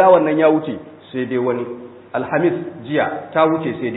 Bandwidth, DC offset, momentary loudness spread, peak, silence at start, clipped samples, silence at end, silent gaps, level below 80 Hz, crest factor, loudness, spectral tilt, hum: 4.1 kHz; under 0.1%; 15 LU; 0 dBFS; 0 s; under 0.1%; 0 s; none; -62 dBFS; 18 dB; -18 LUFS; -11.5 dB/octave; none